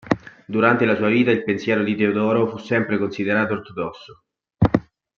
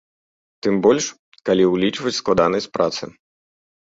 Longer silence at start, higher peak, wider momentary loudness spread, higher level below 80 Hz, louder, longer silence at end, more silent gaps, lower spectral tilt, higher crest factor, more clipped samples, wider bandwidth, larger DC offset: second, 0.05 s vs 0.65 s; about the same, -2 dBFS vs -2 dBFS; second, 9 LU vs 12 LU; first, -48 dBFS vs -54 dBFS; about the same, -20 LUFS vs -19 LUFS; second, 0.35 s vs 0.9 s; second, none vs 1.19-1.32 s; first, -8 dB/octave vs -4.5 dB/octave; about the same, 20 dB vs 18 dB; neither; second, 7 kHz vs 7.8 kHz; neither